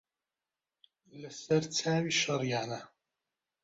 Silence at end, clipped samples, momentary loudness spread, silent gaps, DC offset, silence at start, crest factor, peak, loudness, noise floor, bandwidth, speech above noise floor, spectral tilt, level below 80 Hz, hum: 0.75 s; under 0.1%; 16 LU; none; under 0.1%; 1.15 s; 20 dB; -16 dBFS; -31 LUFS; under -90 dBFS; 8 kHz; over 58 dB; -4 dB/octave; -74 dBFS; none